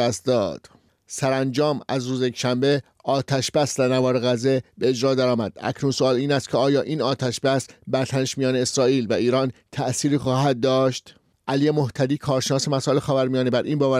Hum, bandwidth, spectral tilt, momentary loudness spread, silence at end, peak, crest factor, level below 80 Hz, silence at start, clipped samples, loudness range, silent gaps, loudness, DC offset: none; 15 kHz; -5.5 dB/octave; 6 LU; 0 s; -10 dBFS; 12 dB; -60 dBFS; 0 s; under 0.1%; 1 LU; none; -22 LUFS; under 0.1%